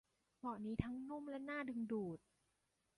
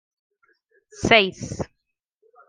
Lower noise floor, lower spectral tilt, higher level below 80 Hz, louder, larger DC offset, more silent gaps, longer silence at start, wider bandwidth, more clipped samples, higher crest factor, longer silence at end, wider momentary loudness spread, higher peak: first, -85 dBFS vs -78 dBFS; first, -8.5 dB/octave vs -4 dB/octave; second, -64 dBFS vs -52 dBFS; second, -46 LUFS vs -20 LUFS; neither; neither; second, 0.45 s vs 1 s; first, 11.5 kHz vs 9.8 kHz; neither; about the same, 24 dB vs 26 dB; about the same, 0.8 s vs 0.85 s; second, 6 LU vs 17 LU; second, -22 dBFS vs 0 dBFS